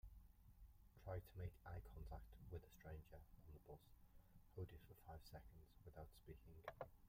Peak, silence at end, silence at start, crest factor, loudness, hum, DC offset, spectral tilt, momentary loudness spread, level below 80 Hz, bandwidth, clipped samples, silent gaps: -36 dBFS; 0 s; 0.05 s; 22 dB; -60 LUFS; none; under 0.1%; -7 dB/octave; 11 LU; -66 dBFS; 16 kHz; under 0.1%; none